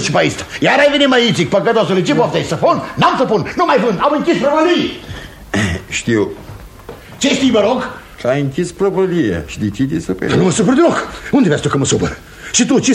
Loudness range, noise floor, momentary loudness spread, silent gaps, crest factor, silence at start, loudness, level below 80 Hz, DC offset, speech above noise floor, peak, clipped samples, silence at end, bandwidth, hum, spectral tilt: 4 LU; -34 dBFS; 11 LU; none; 14 dB; 0 s; -14 LUFS; -40 dBFS; under 0.1%; 20 dB; 0 dBFS; under 0.1%; 0 s; 14 kHz; none; -4.5 dB/octave